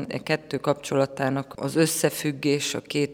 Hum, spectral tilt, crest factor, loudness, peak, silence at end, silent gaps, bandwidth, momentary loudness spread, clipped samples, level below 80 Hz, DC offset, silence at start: none; -4.5 dB/octave; 18 dB; -25 LUFS; -6 dBFS; 0 s; none; over 20 kHz; 5 LU; under 0.1%; -64 dBFS; under 0.1%; 0 s